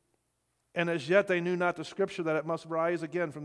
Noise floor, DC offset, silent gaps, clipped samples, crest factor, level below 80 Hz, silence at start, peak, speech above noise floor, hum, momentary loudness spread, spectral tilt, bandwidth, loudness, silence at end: -78 dBFS; under 0.1%; none; under 0.1%; 20 dB; -78 dBFS; 0.75 s; -12 dBFS; 47 dB; none; 7 LU; -6 dB/octave; 11 kHz; -30 LUFS; 0 s